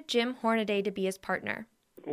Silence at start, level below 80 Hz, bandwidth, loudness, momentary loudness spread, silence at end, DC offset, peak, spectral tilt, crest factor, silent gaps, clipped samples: 0 s; -72 dBFS; 15.5 kHz; -31 LUFS; 13 LU; 0 s; under 0.1%; -14 dBFS; -4.5 dB/octave; 18 dB; none; under 0.1%